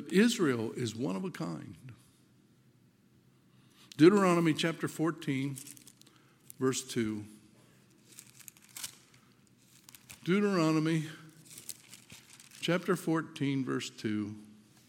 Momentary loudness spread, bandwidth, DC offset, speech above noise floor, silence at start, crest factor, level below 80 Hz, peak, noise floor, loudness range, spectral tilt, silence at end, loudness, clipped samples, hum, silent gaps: 25 LU; 17 kHz; under 0.1%; 35 dB; 0 s; 24 dB; -78 dBFS; -10 dBFS; -65 dBFS; 10 LU; -5.5 dB/octave; 0.4 s; -31 LUFS; under 0.1%; none; none